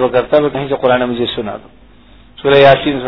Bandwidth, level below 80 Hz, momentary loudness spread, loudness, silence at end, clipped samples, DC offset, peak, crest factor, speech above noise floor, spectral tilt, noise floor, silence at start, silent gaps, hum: 5.4 kHz; -42 dBFS; 15 LU; -12 LUFS; 0 s; 0.4%; under 0.1%; 0 dBFS; 14 dB; 31 dB; -8 dB/octave; -43 dBFS; 0 s; none; none